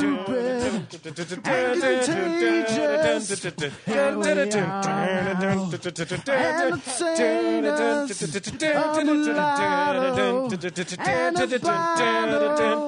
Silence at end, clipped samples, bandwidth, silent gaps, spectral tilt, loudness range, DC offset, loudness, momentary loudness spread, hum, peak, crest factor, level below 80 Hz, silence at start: 0 s; under 0.1%; 10 kHz; none; -4.5 dB/octave; 1 LU; under 0.1%; -23 LUFS; 8 LU; none; -8 dBFS; 14 dB; -60 dBFS; 0 s